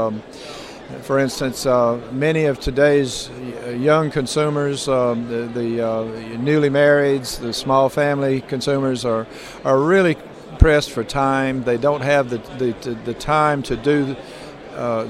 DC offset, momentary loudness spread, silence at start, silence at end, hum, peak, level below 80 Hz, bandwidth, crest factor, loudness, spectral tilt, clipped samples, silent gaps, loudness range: under 0.1%; 13 LU; 0 s; 0 s; none; 0 dBFS; -32 dBFS; 14.5 kHz; 18 dB; -19 LUFS; -5.5 dB/octave; under 0.1%; none; 2 LU